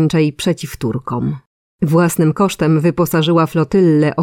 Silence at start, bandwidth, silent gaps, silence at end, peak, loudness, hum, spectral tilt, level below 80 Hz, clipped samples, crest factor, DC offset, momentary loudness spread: 0 s; 16.5 kHz; 1.46-1.79 s; 0 s; -2 dBFS; -15 LUFS; none; -6.5 dB/octave; -44 dBFS; under 0.1%; 12 dB; under 0.1%; 9 LU